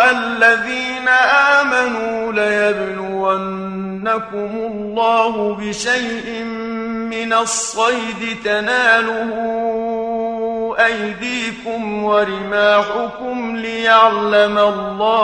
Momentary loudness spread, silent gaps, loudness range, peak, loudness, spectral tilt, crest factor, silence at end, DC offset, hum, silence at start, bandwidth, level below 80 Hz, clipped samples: 11 LU; none; 4 LU; 0 dBFS; -16 LUFS; -3 dB/octave; 16 dB; 0 s; under 0.1%; none; 0 s; 10.5 kHz; -52 dBFS; under 0.1%